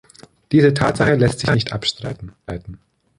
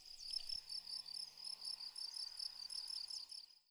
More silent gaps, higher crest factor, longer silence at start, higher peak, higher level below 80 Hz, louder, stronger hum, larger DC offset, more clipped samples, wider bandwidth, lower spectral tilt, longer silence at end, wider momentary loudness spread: neither; about the same, 16 dB vs 18 dB; first, 0.5 s vs 0 s; first, -2 dBFS vs -32 dBFS; first, -42 dBFS vs -74 dBFS; first, -17 LUFS vs -46 LUFS; neither; neither; neither; second, 11.5 kHz vs over 20 kHz; first, -6 dB/octave vs 2.5 dB/octave; first, 0.4 s vs 0.1 s; first, 17 LU vs 4 LU